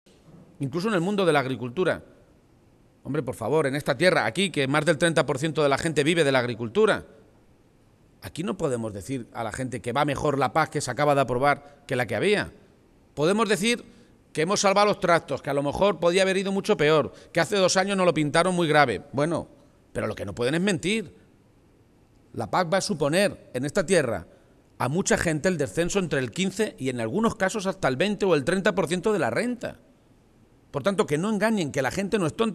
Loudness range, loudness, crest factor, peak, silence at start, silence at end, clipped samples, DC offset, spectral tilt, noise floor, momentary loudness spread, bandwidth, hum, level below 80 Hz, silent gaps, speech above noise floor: 5 LU; -24 LUFS; 20 dB; -6 dBFS; 0.35 s; 0 s; under 0.1%; under 0.1%; -4.5 dB/octave; -58 dBFS; 10 LU; 14 kHz; none; -54 dBFS; none; 34 dB